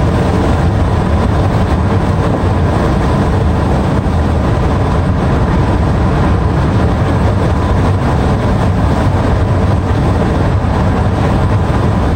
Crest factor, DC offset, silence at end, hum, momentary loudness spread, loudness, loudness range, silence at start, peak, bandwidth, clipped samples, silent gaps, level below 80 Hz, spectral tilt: 8 dB; under 0.1%; 0 s; none; 1 LU; -13 LUFS; 0 LU; 0 s; -2 dBFS; 9.8 kHz; under 0.1%; none; -18 dBFS; -8 dB/octave